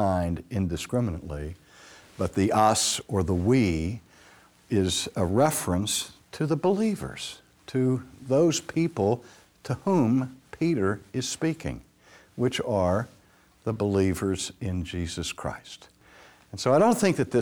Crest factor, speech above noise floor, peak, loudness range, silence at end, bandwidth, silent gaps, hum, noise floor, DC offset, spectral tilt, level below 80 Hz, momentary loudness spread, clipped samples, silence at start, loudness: 18 dB; 33 dB; -8 dBFS; 3 LU; 0 s; over 20 kHz; none; none; -59 dBFS; under 0.1%; -5 dB/octave; -50 dBFS; 15 LU; under 0.1%; 0 s; -26 LUFS